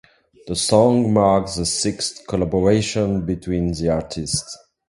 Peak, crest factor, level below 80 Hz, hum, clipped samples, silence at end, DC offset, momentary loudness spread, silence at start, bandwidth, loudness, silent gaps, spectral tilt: 0 dBFS; 20 dB; -40 dBFS; none; under 0.1%; 0.35 s; under 0.1%; 9 LU; 0.45 s; 11.5 kHz; -19 LUFS; none; -5 dB/octave